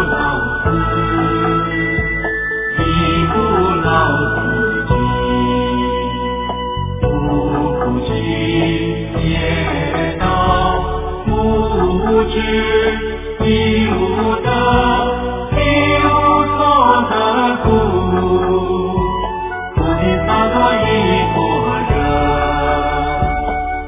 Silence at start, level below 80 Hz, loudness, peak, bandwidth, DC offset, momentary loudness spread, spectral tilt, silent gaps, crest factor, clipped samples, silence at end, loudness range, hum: 0 s; -26 dBFS; -15 LUFS; 0 dBFS; 3.8 kHz; under 0.1%; 6 LU; -10 dB/octave; none; 14 dB; under 0.1%; 0 s; 4 LU; none